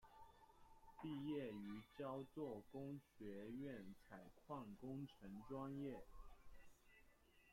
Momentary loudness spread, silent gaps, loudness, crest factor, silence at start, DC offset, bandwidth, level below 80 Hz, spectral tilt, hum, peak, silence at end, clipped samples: 18 LU; none; -54 LUFS; 16 dB; 0 s; under 0.1%; 16.5 kHz; -72 dBFS; -7.5 dB/octave; none; -38 dBFS; 0 s; under 0.1%